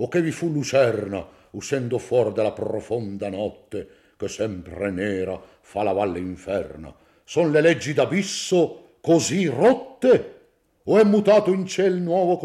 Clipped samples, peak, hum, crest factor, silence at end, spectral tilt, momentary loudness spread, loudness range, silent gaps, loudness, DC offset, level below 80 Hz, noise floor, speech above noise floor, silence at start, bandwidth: under 0.1%; -6 dBFS; none; 16 dB; 0 s; -5.5 dB/octave; 15 LU; 8 LU; none; -22 LUFS; under 0.1%; -60 dBFS; -58 dBFS; 37 dB; 0 s; 13 kHz